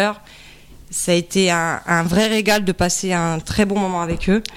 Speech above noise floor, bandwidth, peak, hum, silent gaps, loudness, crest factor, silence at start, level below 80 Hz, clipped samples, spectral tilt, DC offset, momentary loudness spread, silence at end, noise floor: 24 dB; 16.5 kHz; -2 dBFS; none; none; -18 LUFS; 18 dB; 0 s; -38 dBFS; under 0.1%; -4 dB/octave; under 0.1%; 5 LU; 0 s; -42 dBFS